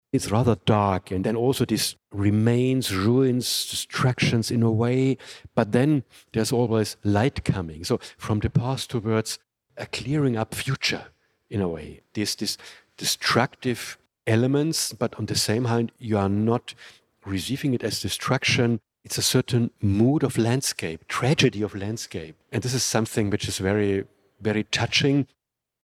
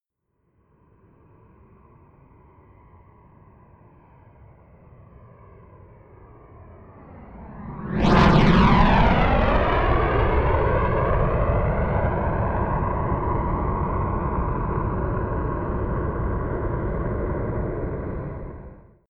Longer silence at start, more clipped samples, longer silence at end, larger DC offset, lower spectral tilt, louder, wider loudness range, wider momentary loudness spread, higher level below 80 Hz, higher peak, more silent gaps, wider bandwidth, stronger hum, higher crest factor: second, 0.15 s vs 4.4 s; neither; first, 0.6 s vs 0.35 s; neither; second, -5 dB/octave vs -8 dB/octave; about the same, -24 LUFS vs -22 LUFS; second, 4 LU vs 9 LU; second, 10 LU vs 15 LU; second, -52 dBFS vs -30 dBFS; about the same, -4 dBFS vs -4 dBFS; neither; first, 16 kHz vs 7.4 kHz; neither; about the same, 20 dB vs 18 dB